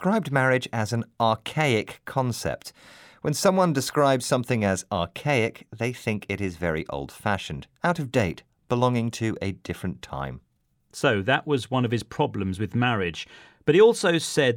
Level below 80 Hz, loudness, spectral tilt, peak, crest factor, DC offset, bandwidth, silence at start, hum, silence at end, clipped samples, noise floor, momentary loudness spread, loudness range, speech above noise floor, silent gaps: -56 dBFS; -25 LUFS; -5 dB/octave; -6 dBFS; 18 dB; under 0.1%; 19 kHz; 0 s; none; 0 s; under 0.1%; -65 dBFS; 11 LU; 4 LU; 41 dB; none